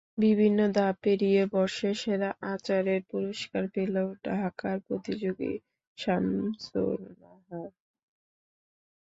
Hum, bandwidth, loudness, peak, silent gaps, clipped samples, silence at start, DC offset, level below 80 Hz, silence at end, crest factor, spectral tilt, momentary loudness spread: none; 8 kHz; -29 LUFS; -14 dBFS; 5.87-5.96 s; under 0.1%; 0.15 s; under 0.1%; -66 dBFS; 1.35 s; 16 dB; -6.5 dB/octave; 12 LU